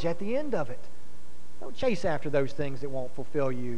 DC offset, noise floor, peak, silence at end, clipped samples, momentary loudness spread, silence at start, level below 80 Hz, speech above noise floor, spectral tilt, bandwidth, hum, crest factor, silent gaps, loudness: 6%; -54 dBFS; -14 dBFS; 0 s; under 0.1%; 11 LU; 0 s; -56 dBFS; 23 dB; -6.5 dB/octave; 11 kHz; none; 20 dB; none; -32 LUFS